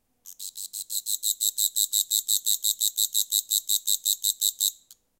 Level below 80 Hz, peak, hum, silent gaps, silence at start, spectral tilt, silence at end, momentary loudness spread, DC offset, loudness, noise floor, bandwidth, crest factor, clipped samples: -80 dBFS; -6 dBFS; none; none; 0.25 s; 5 dB/octave; 0.25 s; 10 LU; under 0.1%; -23 LUFS; -51 dBFS; 17.5 kHz; 22 dB; under 0.1%